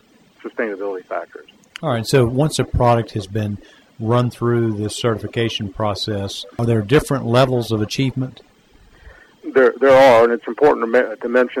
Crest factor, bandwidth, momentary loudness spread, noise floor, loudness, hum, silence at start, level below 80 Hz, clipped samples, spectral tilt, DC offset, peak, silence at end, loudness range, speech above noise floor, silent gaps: 14 dB; 16 kHz; 13 LU; -50 dBFS; -18 LUFS; none; 0.45 s; -42 dBFS; under 0.1%; -6 dB/octave; under 0.1%; -4 dBFS; 0 s; 5 LU; 33 dB; none